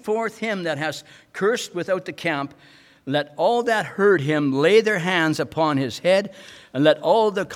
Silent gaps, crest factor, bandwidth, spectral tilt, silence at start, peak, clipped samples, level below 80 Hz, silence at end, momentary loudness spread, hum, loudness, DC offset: none; 18 dB; 15 kHz; -5 dB/octave; 0.05 s; -4 dBFS; under 0.1%; -66 dBFS; 0 s; 11 LU; none; -21 LUFS; under 0.1%